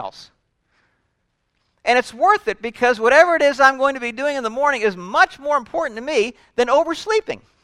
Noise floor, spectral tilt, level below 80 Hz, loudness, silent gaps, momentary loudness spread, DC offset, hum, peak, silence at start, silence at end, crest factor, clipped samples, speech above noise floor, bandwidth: -70 dBFS; -3 dB/octave; -56 dBFS; -18 LUFS; none; 10 LU; under 0.1%; none; 0 dBFS; 0 s; 0.25 s; 18 dB; under 0.1%; 52 dB; 12.5 kHz